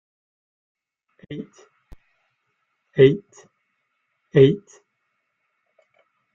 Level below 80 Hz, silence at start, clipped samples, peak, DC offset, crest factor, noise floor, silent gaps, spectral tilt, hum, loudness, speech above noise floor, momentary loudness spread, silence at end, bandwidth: -58 dBFS; 1.3 s; under 0.1%; -2 dBFS; under 0.1%; 22 dB; -74 dBFS; none; -8 dB/octave; none; -18 LUFS; 56 dB; 21 LU; 1.75 s; 7.2 kHz